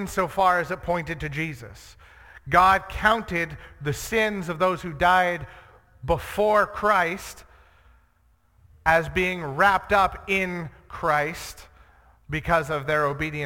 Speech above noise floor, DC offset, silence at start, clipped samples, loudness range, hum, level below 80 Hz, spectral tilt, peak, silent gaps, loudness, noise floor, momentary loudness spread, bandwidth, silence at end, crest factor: 39 dB; under 0.1%; 0 s; under 0.1%; 3 LU; none; -44 dBFS; -5 dB/octave; -4 dBFS; none; -23 LUFS; -62 dBFS; 14 LU; 17.5 kHz; 0 s; 20 dB